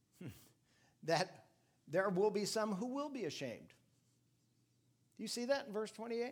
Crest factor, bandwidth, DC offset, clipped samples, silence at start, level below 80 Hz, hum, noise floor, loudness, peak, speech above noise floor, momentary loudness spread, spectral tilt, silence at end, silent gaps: 22 dB; 18 kHz; under 0.1%; under 0.1%; 0.2 s; -86 dBFS; none; -77 dBFS; -40 LUFS; -20 dBFS; 37 dB; 14 LU; -4.5 dB/octave; 0 s; none